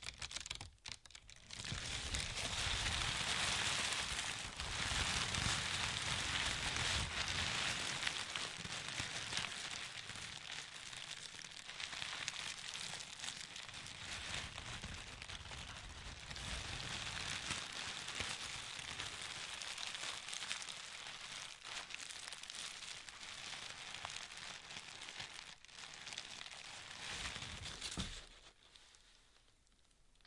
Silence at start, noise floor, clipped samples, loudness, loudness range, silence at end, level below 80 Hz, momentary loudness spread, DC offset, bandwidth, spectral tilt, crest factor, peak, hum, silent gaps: 0 s; -71 dBFS; under 0.1%; -42 LUFS; 10 LU; 0.05 s; -58 dBFS; 12 LU; under 0.1%; 12 kHz; -1 dB/octave; 28 dB; -16 dBFS; none; none